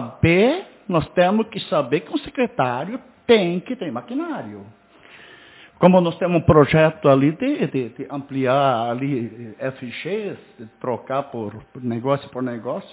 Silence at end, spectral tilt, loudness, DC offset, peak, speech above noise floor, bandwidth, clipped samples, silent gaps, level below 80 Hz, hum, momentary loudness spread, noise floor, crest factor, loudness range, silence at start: 0.1 s; -11 dB/octave; -20 LUFS; under 0.1%; 0 dBFS; 27 dB; 4 kHz; under 0.1%; none; -46 dBFS; none; 15 LU; -47 dBFS; 20 dB; 9 LU; 0 s